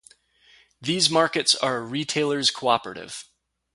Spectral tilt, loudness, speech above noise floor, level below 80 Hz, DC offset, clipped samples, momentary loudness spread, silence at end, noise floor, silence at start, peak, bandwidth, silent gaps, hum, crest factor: -2.5 dB/octave; -22 LUFS; 34 dB; -66 dBFS; under 0.1%; under 0.1%; 16 LU; 0.5 s; -58 dBFS; 0.8 s; -4 dBFS; 11.5 kHz; none; none; 20 dB